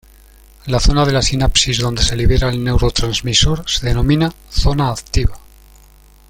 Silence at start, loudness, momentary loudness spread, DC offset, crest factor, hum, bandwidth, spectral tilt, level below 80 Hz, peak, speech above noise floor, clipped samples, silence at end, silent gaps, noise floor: 0.65 s; -16 LUFS; 6 LU; under 0.1%; 16 dB; none; 16.5 kHz; -4.5 dB/octave; -20 dBFS; 0 dBFS; 30 dB; under 0.1%; 0.9 s; none; -45 dBFS